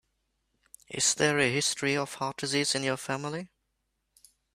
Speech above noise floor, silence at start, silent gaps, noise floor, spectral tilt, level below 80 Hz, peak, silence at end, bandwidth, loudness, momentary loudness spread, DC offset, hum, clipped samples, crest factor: 50 dB; 0.9 s; none; -79 dBFS; -2.5 dB/octave; -70 dBFS; -8 dBFS; 1.1 s; 15.5 kHz; -28 LUFS; 13 LU; under 0.1%; none; under 0.1%; 22 dB